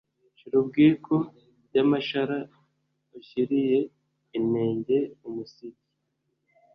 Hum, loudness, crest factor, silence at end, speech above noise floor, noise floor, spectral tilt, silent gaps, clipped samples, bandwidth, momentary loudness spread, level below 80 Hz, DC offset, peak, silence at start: none; -26 LUFS; 18 dB; 1.05 s; 52 dB; -77 dBFS; -9 dB/octave; none; under 0.1%; 6 kHz; 17 LU; -68 dBFS; under 0.1%; -8 dBFS; 0.45 s